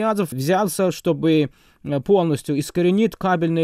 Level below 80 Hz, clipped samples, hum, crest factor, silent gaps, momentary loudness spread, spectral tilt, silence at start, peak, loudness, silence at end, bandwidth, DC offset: -54 dBFS; under 0.1%; none; 14 dB; none; 7 LU; -6.5 dB/octave; 0 s; -6 dBFS; -20 LUFS; 0 s; 16 kHz; under 0.1%